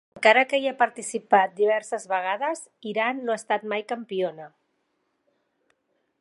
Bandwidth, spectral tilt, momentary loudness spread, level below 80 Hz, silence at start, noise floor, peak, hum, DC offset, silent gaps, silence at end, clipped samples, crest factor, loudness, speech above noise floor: 11.5 kHz; -3 dB/octave; 12 LU; -82 dBFS; 0.15 s; -74 dBFS; -2 dBFS; none; under 0.1%; none; 1.75 s; under 0.1%; 24 dB; -24 LUFS; 50 dB